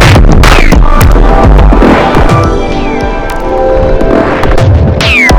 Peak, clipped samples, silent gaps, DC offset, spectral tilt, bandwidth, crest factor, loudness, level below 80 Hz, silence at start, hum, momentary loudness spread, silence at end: 0 dBFS; 30%; none; under 0.1%; -6 dB/octave; 18 kHz; 4 dB; -6 LUFS; -8 dBFS; 0 s; none; 7 LU; 0 s